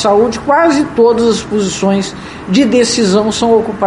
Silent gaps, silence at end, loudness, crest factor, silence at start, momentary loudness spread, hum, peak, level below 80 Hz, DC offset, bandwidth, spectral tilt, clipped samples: none; 0 s; -11 LUFS; 12 dB; 0 s; 6 LU; none; 0 dBFS; -40 dBFS; under 0.1%; 11.5 kHz; -4.5 dB/octave; under 0.1%